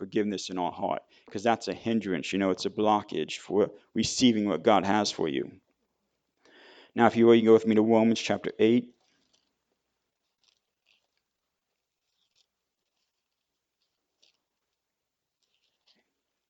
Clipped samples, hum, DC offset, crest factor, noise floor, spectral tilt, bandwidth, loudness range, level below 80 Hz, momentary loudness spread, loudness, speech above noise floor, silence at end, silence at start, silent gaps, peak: under 0.1%; none; under 0.1%; 24 dB; -86 dBFS; -5 dB/octave; 9 kHz; 5 LU; -68 dBFS; 12 LU; -26 LUFS; 60 dB; 7.65 s; 0 s; none; -4 dBFS